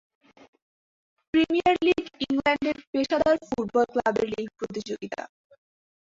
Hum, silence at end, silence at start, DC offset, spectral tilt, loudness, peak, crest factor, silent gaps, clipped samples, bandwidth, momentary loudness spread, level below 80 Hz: none; 0.85 s; 1.35 s; under 0.1%; -5 dB/octave; -25 LUFS; -8 dBFS; 18 dB; 2.87-2.93 s; under 0.1%; 7.8 kHz; 12 LU; -58 dBFS